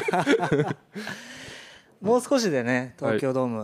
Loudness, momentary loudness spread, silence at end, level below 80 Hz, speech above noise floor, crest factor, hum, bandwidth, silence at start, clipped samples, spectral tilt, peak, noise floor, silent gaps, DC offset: -25 LUFS; 17 LU; 0 s; -64 dBFS; 22 dB; 18 dB; none; 15 kHz; 0 s; under 0.1%; -5.5 dB/octave; -8 dBFS; -47 dBFS; none; under 0.1%